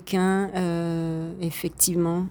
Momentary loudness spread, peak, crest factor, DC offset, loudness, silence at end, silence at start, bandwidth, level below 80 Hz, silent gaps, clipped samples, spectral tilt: 9 LU; -6 dBFS; 18 dB; under 0.1%; -25 LUFS; 0 s; 0 s; over 20 kHz; -52 dBFS; none; under 0.1%; -5 dB/octave